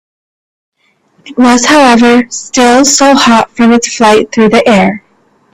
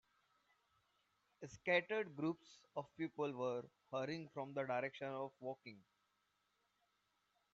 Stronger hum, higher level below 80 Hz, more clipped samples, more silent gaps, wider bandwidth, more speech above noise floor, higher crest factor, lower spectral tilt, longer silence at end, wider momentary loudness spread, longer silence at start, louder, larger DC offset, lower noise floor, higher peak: neither; first, -44 dBFS vs -86 dBFS; first, 0.3% vs under 0.1%; neither; first, 14.5 kHz vs 7.6 kHz; first, 45 dB vs 40 dB; second, 8 dB vs 24 dB; about the same, -3.5 dB/octave vs -4 dB/octave; second, 0.55 s vs 1.75 s; second, 6 LU vs 14 LU; second, 1.25 s vs 1.4 s; first, -6 LUFS vs -44 LUFS; first, 0.4% vs under 0.1%; second, -52 dBFS vs -84 dBFS; first, 0 dBFS vs -22 dBFS